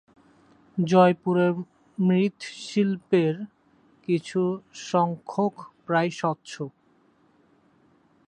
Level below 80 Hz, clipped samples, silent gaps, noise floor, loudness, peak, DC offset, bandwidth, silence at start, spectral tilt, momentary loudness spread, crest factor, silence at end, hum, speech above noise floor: -72 dBFS; under 0.1%; none; -62 dBFS; -25 LUFS; -6 dBFS; under 0.1%; 9.2 kHz; 0.75 s; -7 dB/octave; 16 LU; 20 dB; 1.6 s; none; 38 dB